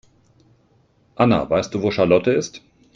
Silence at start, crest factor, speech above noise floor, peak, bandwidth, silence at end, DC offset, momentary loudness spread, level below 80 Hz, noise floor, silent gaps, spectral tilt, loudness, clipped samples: 1.2 s; 18 dB; 41 dB; -2 dBFS; 7.6 kHz; 0.4 s; under 0.1%; 6 LU; -52 dBFS; -59 dBFS; none; -6 dB/octave; -19 LUFS; under 0.1%